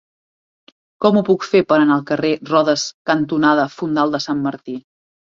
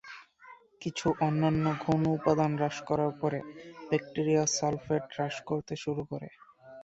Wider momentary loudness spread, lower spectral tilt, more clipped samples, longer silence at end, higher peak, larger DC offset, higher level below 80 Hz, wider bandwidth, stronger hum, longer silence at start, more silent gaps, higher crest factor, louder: second, 8 LU vs 13 LU; about the same, -5.5 dB/octave vs -5.5 dB/octave; neither; first, 0.6 s vs 0 s; first, -2 dBFS vs -10 dBFS; neither; about the same, -60 dBFS vs -62 dBFS; about the same, 7.6 kHz vs 8 kHz; neither; first, 1 s vs 0.05 s; first, 2.94-3.05 s vs none; about the same, 16 dB vs 20 dB; first, -17 LUFS vs -30 LUFS